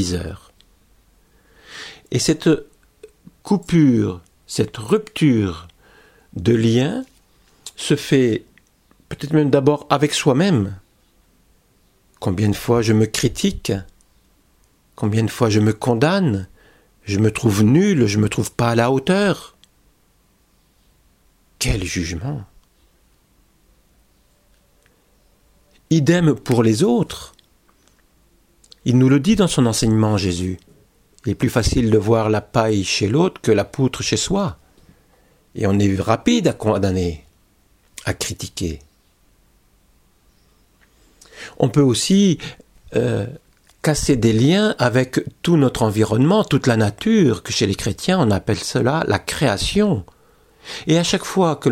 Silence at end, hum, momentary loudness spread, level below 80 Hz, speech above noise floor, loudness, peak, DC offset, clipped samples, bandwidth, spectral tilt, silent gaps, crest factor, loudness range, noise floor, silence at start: 0 s; none; 13 LU; -42 dBFS; 41 dB; -18 LUFS; 0 dBFS; under 0.1%; under 0.1%; 16 kHz; -5.5 dB/octave; none; 20 dB; 10 LU; -59 dBFS; 0 s